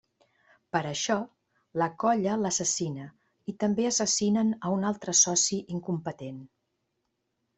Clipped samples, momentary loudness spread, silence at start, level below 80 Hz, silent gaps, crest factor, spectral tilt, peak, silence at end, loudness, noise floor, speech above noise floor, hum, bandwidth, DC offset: under 0.1%; 19 LU; 0.75 s; -70 dBFS; none; 20 dB; -3.5 dB/octave; -10 dBFS; 1.1 s; -27 LUFS; -79 dBFS; 52 dB; none; 8.4 kHz; under 0.1%